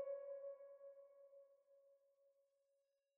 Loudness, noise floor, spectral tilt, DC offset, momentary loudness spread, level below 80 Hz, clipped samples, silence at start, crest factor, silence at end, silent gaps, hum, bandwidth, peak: -56 LUFS; -87 dBFS; 4 dB/octave; under 0.1%; 16 LU; under -90 dBFS; under 0.1%; 0 s; 18 dB; 0.85 s; none; none; 2.7 kHz; -38 dBFS